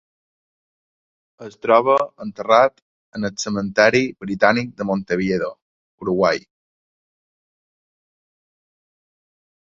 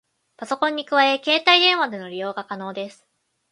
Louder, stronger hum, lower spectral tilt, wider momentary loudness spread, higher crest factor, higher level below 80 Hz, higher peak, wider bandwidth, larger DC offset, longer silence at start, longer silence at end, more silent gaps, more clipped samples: about the same, -19 LUFS vs -19 LUFS; neither; first, -5 dB/octave vs -3 dB/octave; second, 14 LU vs 17 LU; about the same, 22 dB vs 22 dB; first, -58 dBFS vs -78 dBFS; about the same, 0 dBFS vs 0 dBFS; second, 7.8 kHz vs 11.5 kHz; neither; first, 1.4 s vs 0.4 s; first, 3.35 s vs 0.6 s; first, 2.82-3.12 s, 5.62-5.98 s vs none; neither